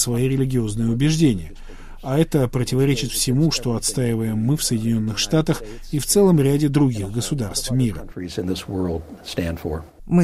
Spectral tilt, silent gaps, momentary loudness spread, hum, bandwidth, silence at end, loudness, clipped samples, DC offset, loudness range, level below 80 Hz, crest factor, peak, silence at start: -5.5 dB/octave; none; 11 LU; none; 15.5 kHz; 0 s; -21 LUFS; under 0.1%; under 0.1%; 3 LU; -36 dBFS; 16 dB; -4 dBFS; 0 s